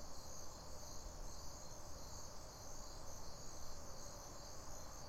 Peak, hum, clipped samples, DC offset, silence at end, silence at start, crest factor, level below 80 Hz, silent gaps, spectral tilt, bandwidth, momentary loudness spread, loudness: -36 dBFS; none; under 0.1%; under 0.1%; 0 s; 0 s; 12 dB; -56 dBFS; none; -3 dB/octave; 16 kHz; 1 LU; -54 LUFS